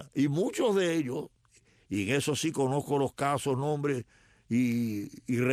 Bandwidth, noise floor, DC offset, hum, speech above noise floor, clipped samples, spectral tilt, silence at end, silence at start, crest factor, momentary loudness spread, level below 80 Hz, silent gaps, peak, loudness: 14.5 kHz; -64 dBFS; under 0.1%; none; 35 dB; under 0.1%; -5.5 dB/octave; 0 s; 0 s; 16 dB; 8 LU; -68 dBFS; none; -14 dBFS; -30 LUFS